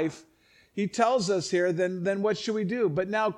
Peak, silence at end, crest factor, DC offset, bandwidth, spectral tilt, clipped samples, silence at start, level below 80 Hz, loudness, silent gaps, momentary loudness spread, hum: -10 dBFS; 0 s; 18 dB; under 0.1%; 11.5 kHz; -5 dB/octave; under 0.1%; 0 s; -68 dBFS; -27 LUFS; none; 7 LU; none